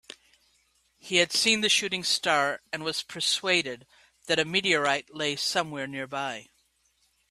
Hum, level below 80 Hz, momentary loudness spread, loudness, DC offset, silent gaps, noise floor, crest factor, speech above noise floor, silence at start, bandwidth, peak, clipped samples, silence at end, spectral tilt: none; -70 dBFS; 11 LU; -26 LUFS; under 0.1%; none; -70 dBFS; 22 dB; 42 dB; 1.05 s; 15.5 kHz; -6 dBFS; under 0.1%; 0.85 s; -1.5 dB/octave